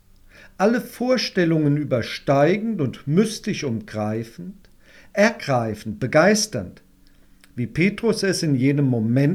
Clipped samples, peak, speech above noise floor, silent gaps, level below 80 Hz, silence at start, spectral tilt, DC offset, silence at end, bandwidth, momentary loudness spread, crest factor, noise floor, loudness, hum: under 0.1%; -4 dBFS; 32 dB; none; -52 dBFS; 0.6 s; -5.5 dB/octave; under 0.1%; 0 s; 15 kHz; 11 LU; 18 dB; -52 dBFS; -21 LUFS; none